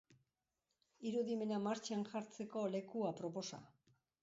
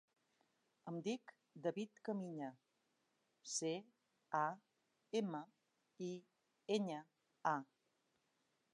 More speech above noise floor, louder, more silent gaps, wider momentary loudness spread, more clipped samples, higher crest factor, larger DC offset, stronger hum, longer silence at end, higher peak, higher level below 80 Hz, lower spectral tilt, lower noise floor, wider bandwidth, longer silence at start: first, 47 dB vs 40 dB; about the same, -43 LUFS vs -45 LUFS; neither; second, 8 LU vs 16 LU; neither; second, 16 dB vs 24 dB; neither; neither; second, 0.55 s vs 1.1 s; second, -28 dBFS vs -24 dBFS; about the same, -86 dBFS vs under -90 dBFS; about the same, -5.5 dB/octave vs -4.5 dB/octave; first, -89 dBFS vs -84 dBFS; second, 7.6 kHz vs 10 kHz; first, 1 s vs 0.85 s